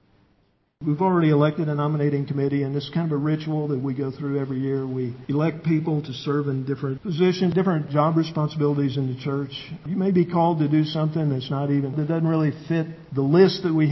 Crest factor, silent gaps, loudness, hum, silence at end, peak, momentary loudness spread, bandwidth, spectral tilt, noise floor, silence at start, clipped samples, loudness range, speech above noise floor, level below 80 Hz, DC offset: 18 dB; none; -23 LUFS; none; 0 s; -4 dBFS; 8 LU; 6 kHz; -9 dB/octave; -65 dBFS; 0.8 s; under 0.1%; 3 LU; 43 dB; -60 dBFS; under 0.1%